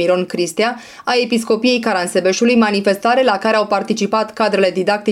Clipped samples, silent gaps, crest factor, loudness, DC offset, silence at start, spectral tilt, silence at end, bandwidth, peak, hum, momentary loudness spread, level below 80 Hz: under 0.1%; none; 12 dB; -16 LUFS; under 0.1%; 0 s; -4 dB/octave; 0 s; 15.5 kHz; -4 dBFS; none; 5 LU; -62 dBFS